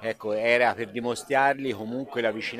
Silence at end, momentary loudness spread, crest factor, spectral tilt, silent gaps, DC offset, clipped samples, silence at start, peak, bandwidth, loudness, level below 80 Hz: 0 s; 9 LU; 18 dB; -4.5 dB/octave; none; under 0.1%; under 0.1%; 0 s; -8 dBFS; 15 kHz; -26 LUFS; -70 dBFS